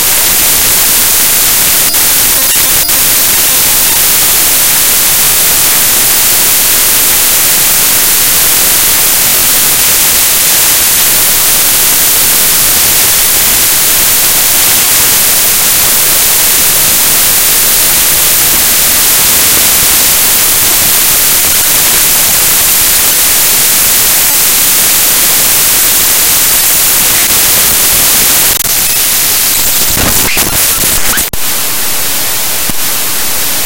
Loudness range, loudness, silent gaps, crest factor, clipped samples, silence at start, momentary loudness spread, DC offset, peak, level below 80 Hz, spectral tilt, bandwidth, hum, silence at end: 1 LU; -4 LUFS; none; 8 dB; 3%; 0 s; 2 LU; 5%; 0 dBFS; -30 dBFS; 0.5 dB/octave; over 20 kHz; none; 0 s